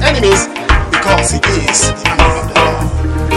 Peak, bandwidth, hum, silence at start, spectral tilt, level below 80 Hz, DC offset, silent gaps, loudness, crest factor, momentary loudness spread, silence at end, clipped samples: 0 dBFS; 13.5 kHz; none; 0 s; -3.5 dB/octave; -18 dBFS; under 0.1%; none; -11 LUFS; 12 dB; 4 LU; 0 s; under 0.1%